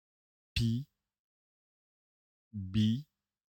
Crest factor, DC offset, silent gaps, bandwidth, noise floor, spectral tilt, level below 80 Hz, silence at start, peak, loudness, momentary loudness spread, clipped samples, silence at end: 18 dB; under 0.1%; 1.19-2.51 s; 16.5 kHz; under -90 dBFS; -6.5 dB/octave; -54 dBFS; 0.55 s; -20 dBFS; -35 LUFS; 15 LU; under 0.1%; 0.55 s